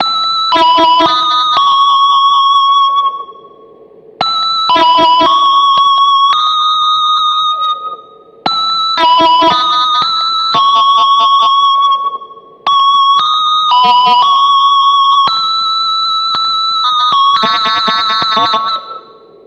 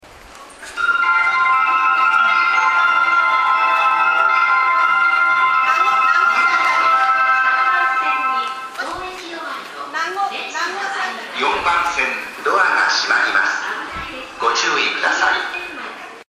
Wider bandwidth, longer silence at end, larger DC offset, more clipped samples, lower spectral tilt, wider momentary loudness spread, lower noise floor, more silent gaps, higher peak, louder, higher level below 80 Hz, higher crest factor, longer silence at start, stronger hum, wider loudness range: second, 8.4 kHz vs 13.5 kHz; first, 0.45 s vs 0.1 s; neither; neither; first, -2 dB/octave vs -0.5 dB/octave; second, 7 LU vs 13 LU; about the same, -38 dBFS vs -40 dBFS; neither; about the same, 0 dBFS vs -2 dBFS; first, -9 LUFS vs -15 LUFS; about the same, -54 dBFS vs -54 dBFS; second, 10 dB vs 16 dB; about the same, 0 s vs 0.05 s; neither; second, 2 LU vs 7 LU